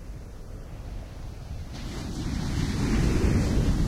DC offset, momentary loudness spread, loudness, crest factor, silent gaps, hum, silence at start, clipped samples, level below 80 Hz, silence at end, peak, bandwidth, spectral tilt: under 0.1%; 18 LU; -28 LUFS; 16 dB; none; none; 0 s; under 0.1%; -32 dBFS; 0 s; -12 dBFS; 15 kHz; -6.5 dB/octave